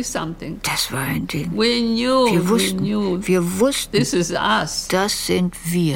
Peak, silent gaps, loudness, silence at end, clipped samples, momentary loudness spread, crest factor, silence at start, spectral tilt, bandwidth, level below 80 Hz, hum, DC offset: -6 dBFS; none; -19 LUFS; 0 s; under 0.1%; 7 LU; 14 dB; 0 s; -4.5 dB/octave; 17 kHz; -42 dBFS; none; under 0.1%